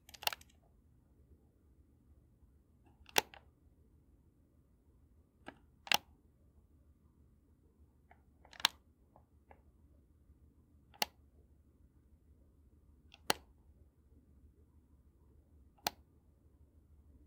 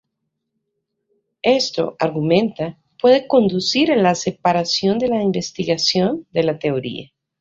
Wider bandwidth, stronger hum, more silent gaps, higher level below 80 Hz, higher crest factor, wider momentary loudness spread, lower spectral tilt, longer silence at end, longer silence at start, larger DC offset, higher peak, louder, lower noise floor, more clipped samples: first, 16 kHz vs 7.8 kHz; neither; neither; second, -68 dBFS vs -58 dBFS; first, 40 dB vs 18 dB; first, 26 LU vs 8 LU; second, -0.5 dB/octave vs -5 dB/octave; first, 1.35 s vs 0.35 s; second, 0.25 s vs 1.45 s; neither; second, -8 dBFS vs -2 dBFS; second, -38 LUFS vs -18 LUFS; second, -69 dBFS vs -76 dBFS; neither